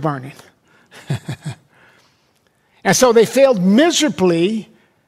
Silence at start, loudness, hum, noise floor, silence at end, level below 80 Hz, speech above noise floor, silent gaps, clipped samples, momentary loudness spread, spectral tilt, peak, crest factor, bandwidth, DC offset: 0 s; -15 LUFS; none; -60 dBFS; 0.45 s; -56 dBFS; 45 dB; none; under 0.1%; 18 LU; -4.5 dB/octave; -2 dBFS; 16 dB; 16 kHz; under 0.1%